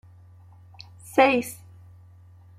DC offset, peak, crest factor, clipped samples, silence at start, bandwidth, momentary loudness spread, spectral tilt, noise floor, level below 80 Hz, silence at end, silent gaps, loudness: under 0.1%; -6 dBFS; 22 dB; under 0.1%; 1.15 s; 16 kHz; 27 LU; -4.5 dB/octave; -50 dBFS; -68 dBFS; 1.05 s; none; -21 LUFS